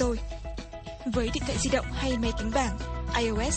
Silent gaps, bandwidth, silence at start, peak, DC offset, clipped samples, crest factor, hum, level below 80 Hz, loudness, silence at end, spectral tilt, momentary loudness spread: none; 9.2 kHz; 0 s; -12 dBFS; under 0.1%; under 0.1%; 18 dB; none; -34 dBFS; -30 LUFS; 0 s; -4.5 dB/octave; 12 LU